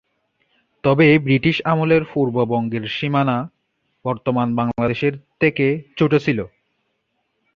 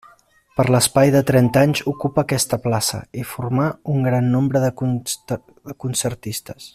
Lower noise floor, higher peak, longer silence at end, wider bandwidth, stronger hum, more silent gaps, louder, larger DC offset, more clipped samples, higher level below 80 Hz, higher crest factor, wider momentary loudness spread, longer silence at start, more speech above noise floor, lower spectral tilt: first, -71 dBFS vs -54 dBFS; about the same, -2 dBFS vs -2 dBFS; first, 1.1 s vs 0.05 s; second, 6.8 kHz vs 15 kHz; neither; neither; about the same, -19 LUFS vs -19 LUFS; neither; neither; about the same, -52 dBFS vs -50 dBFS; about the same, 18 dB vs 16 dB; second, 10 LU vs 14 LU; first, 0.85 s vs 0.55 s; first, 53 dB vs 35 dB; first, -8.5 dB/octave vs -5 dB/octave